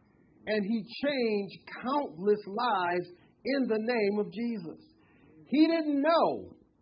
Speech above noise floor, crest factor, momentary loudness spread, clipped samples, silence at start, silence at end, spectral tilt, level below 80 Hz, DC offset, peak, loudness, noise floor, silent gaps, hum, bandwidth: 30 dB; 18 dB; 14 LU; under 0.1%; 0.45 s; 0.3 s; -9.5 dB/octave; -72 dBFS; under 0.1%; -14 dBFS; -30 LUFS; -60 dBFS; none; none; 5.4 kHz